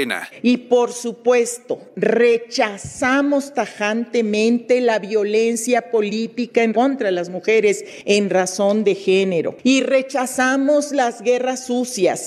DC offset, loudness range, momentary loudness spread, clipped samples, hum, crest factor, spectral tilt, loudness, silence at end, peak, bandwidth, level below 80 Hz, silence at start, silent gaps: under 0.1%; 1 LU; 6 LU; under 0.1%; none; 16 dB; -4 dB/octave; -18 LUFS; 0 s; -2 dBFS; 13.5 kHz; -66 dBFS; 0 s; none